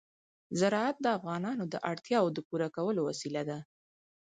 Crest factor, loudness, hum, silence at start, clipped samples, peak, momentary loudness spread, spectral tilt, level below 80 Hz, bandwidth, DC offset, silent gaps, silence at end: 18 dB; -33 LUFS; none; 0.5 s; under 0.1%; -14 dBFS; 7 LU; -5.5 dB/octave; -78 dBFS; 9.4 kHz; under 0.1%; 2.45-2.50 s; 0.6 s